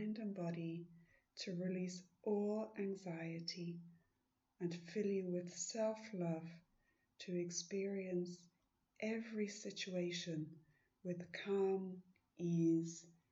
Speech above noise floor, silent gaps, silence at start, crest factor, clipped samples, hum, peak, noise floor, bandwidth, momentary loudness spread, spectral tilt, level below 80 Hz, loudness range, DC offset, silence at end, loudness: 43 dB; none; 0 s; 16 dB; under 0.1%; none; -28 dBFS; -85 dBFS; 8 kHz; 12 LU; -5.5 dB/octave; -88 dBFS; 3 LU; under 0.1%; 0.2 s; -44 LUFS